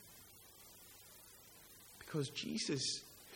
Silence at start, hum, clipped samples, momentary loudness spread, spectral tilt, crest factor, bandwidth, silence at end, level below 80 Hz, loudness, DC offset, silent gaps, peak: 0 s; none; under 0.1%; 19 LU; -3.5 dB/octave; 20 dB; 17 kHz; 0 s; -76 dBFS; -41 LUFS; under 0.1%; none; -26 dBFS